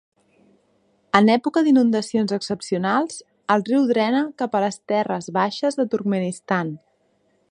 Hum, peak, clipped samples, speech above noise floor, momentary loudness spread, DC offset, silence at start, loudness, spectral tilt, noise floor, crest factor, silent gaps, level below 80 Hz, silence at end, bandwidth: none; 0 dBFS; under 0.1%; 45 dB; 8 LU; under 0.1%; 1.15 s; -21 LUFS; -5.5 dB/octave; -65 dBFS; 22 dB; none; -66 dBFS; 0.75 s; 10.5 kHz